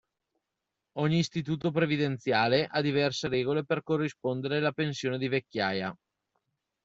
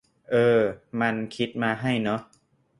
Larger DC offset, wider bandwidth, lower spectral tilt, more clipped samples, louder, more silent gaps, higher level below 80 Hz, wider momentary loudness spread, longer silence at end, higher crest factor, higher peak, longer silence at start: neither; second, 8 kHz vs 11 kHz; about the same, -6 dB/octave vs -7 dB/octave; neither; second, -29 LUFS vs -25 LUFS; neither; about the same, -66 dBFS vs -62 dBFS; second, 5 LU vs 9 LU; first, 0.9 s vs 0.55 s; about the same, 20 dB vs 18 dB; about the same, -10 dBFS vs -8 dBFS; first, 0.95 s vs 0.3 s